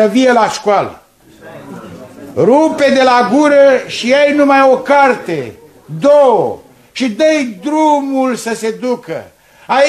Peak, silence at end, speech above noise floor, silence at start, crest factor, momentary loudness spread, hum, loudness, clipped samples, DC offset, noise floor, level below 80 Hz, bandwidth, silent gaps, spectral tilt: 0 dBFS; 0 s; 27 dB; 0 s; 12 dB; 18 LU; none; -11 LUFS; under 0.1%; under 0.1%; -38 dBFS; -58 dBFS; 13.5 kHz; none; -4.5 dB/octave